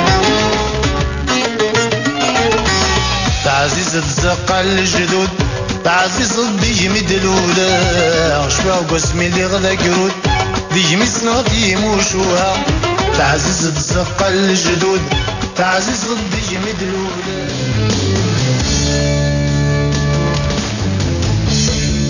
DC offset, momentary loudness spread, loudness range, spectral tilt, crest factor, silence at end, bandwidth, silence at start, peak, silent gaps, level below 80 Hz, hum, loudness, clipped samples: under 0.1%; 5 LU; 3 LU; -4 dB/octave; 14 dB; 0 s; 7.4 kHz; 0 s; 0 dBFS; none; -26 dBFS; none; -14 LUFS; under 0.1%